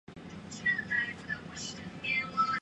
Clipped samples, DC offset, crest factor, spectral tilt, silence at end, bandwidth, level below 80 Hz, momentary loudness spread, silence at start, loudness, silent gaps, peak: under 0.1%; under 0.1%; 16 dB; -3 dB/octave; 0 s; 10.5 kHz; -62 dBFS; 14 LU; 0.1 s; -33 LUFS; none; -18 dBFS